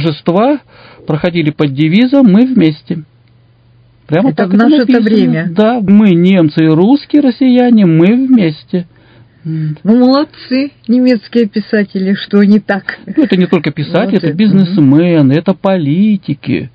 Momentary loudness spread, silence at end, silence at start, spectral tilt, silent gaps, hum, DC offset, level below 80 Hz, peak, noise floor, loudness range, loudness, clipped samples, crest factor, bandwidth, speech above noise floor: 9 LU; 0.05 s; 0 s; -9.5 dB/octave; none; none; under 0.1%; -50 dBFS; 0 dBFS; -46 dBFS; 4 LU; -10 LUFS; 0.8%; 10 dB; 5.2 kHz; 37 dB